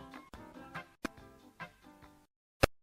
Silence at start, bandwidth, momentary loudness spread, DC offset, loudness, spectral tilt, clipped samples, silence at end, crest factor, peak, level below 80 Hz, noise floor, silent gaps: 0 s; 16 kHz; 24 LU; under 0.1%; -42 LUFS; -4.5 dB/octave; under 0.1%; 0.05 s; 34 dB; -8 dBFS; -50 dBFS; -59 dBFS; 2.36-2.60 s